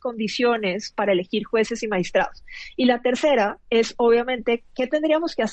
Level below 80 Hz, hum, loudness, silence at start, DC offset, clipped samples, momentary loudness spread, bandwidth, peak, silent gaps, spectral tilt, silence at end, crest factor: -54 dBFS; none; -22 LUFS; 0.05 s; under 0.1%; under 0.1%; 6 LU; 8.6 kHz; -6 dBFS; none; -4.5 dB/octave; 0 s; 16 dB